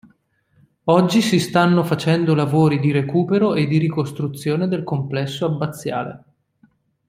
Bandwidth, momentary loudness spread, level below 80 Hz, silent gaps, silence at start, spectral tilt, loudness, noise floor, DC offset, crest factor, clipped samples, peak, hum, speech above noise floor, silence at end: 15.5 kHz; 9 LU; -58 dBFS; none; 0.85 s; -6.5 dB/octave; -19 LUFS; -60 dBFS; under 0.1%; 18 dB; under 0.1%; -2 dBFS; none; 42 dB; 0.9 s